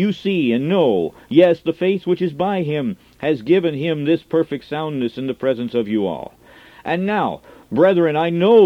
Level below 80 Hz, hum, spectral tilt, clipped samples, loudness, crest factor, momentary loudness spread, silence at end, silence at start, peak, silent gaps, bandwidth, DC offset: -58 dBFS; none; -8.5 dB/octave; under 0.1%; -19 LUFS; 18 dB; 10 LU; 0 s; 0 s; 0 dBFS; none; 6.8 kHz; under 0.1%